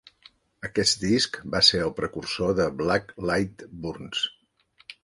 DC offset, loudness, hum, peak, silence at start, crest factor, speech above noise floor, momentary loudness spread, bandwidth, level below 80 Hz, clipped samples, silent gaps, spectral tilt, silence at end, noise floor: under 0.1%; -24 LUFS; none; -4 dBFS; 0.6 s; 24 dB; 37 dB; 15 LU; 11.5 kHz; -52 dBFS; under 0.1%; none; -3.5 dB/octave; 0.1 s; -63 dBFS